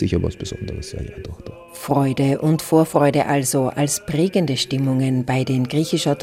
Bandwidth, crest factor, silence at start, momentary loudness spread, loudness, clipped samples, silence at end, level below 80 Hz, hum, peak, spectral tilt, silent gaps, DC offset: 16 kHz; 16 dB; 0 s; 15 LU; -20 LUFS; under 0.1%; 0 s; -44 dBFS; none; -2 dBFS; -5.5 dB/octave; none; under 0.1%